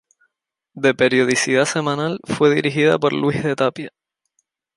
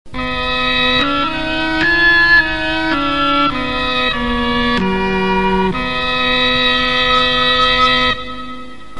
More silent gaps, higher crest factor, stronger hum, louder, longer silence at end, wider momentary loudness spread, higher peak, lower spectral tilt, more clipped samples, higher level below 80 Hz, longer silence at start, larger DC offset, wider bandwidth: neither; about the same, 18 dB vs 14 dB; neither; second, -18 LUFS vs -13 LUFS; first, 0.9 s vs 0 s; about the same, 7 LU vs 7 LU; about the same, -2 dBFS vs 0 dBFS; about the same, -4.5 dB/octave vs -4.5 dB/octave; neither; second, -60 dBFS vs -32 dBFS; first, 0.75 s vs 0.15 s; second, under 0.1% vs 3%; about the same, 11.5 kHz vs 11.5 kHz